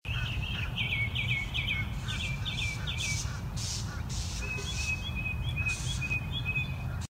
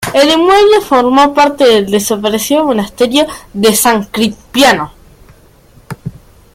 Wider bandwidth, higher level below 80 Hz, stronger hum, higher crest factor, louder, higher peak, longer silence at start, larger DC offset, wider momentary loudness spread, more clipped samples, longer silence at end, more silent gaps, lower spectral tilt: about the same, 16 kHz vs 16.5 kHz; about the same, -40 dBFS vs -42 dBFS; neither; about the same, 14 dB vs 10 dB; second, -32 LUFS vs -10 LUFS; second, -18 dBFS vs 0 dBFS; about the same, 0.05 s vs 0 s; neither; second, 5 LU vs 16 LU; neither; second, 0.05 s vs 0.45 s; neither; about the same, -3.5 dB/octave vs -3.5 dB/octave